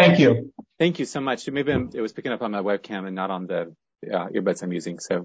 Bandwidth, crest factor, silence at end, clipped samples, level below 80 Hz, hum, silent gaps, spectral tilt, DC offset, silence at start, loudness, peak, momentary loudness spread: 8 kHz; 20 dB; 0 s; under 0.1%; -54 dBFS; none; none; -6 dB/octave; under 0.1%; 0 s; -25 LUFS; -4 dBFS; 10 LU